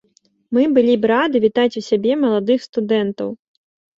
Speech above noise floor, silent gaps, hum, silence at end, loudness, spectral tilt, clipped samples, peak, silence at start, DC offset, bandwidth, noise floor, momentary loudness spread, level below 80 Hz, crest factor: 42 dB; 2.69-2.73 s; none; 0.65 s; -17 LUFS; -6.5 dB/octave; under 0.1%; -2 dBFS; 0.5 s; under 0.1%; 7.8 kHz; -59 dBFS; 9 LU; -62 dBFS; 14 dB